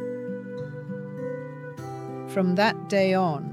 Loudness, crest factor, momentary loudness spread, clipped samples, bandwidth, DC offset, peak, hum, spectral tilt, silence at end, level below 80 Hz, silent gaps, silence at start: -27 LUFS; 18 dB; 14 LU; under 0.1%; 13 kHz; under 0.1%; -10 dBFS; none; -6.5 dB/octave; 0 s; -74 dBFS; none; 0 s